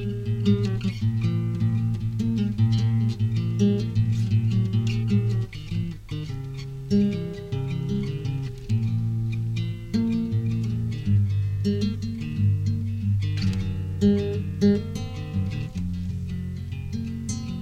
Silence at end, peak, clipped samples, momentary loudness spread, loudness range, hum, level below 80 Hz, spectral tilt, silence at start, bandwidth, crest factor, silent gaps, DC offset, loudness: 0 s; -8 dBFS; under 0.1%; 9 LU; 4 LU; none; -42 dBFS; -8 dB/octave; 0 s; 8.8 kHz; 16 dB; none; under 0.1%; -26 LUFS